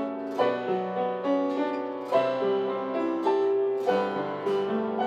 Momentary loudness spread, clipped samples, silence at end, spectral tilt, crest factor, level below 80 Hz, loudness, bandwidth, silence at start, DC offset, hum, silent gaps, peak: 5 LU; under 0.1%; 0 s; -7 dB/octave; 16 dB; -84 dBFS; -27 LUFS; 8.2 kHz; 0 s; under 0.1%; none; none; -12 dBFS